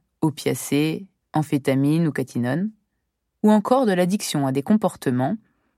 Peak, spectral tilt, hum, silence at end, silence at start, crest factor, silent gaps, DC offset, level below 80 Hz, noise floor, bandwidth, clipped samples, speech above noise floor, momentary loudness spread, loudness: -4 dBFS; -6 dB/octave; none; 0.4 s; 0.2 s; 18 dB; none; under 0.1%; -66 dBFS; -76 dBFS; 16 kHz; under 0.1%; 55 dB; 8 LU; -22 LUFS